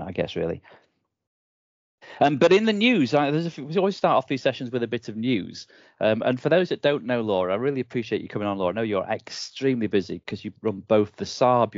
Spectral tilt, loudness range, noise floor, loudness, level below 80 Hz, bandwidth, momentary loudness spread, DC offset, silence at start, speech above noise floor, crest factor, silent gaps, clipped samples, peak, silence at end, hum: -6 dB/octave; 4 LU; under -90 dBFS; -24 LUFS; -64 dBFS; 7.6 kHz; 11 LU; under 0.1%; 0 s; over 66 dB; 18 dB; 1.27-1.98 s; under 0.1%; -6 dBFS; 0 s; none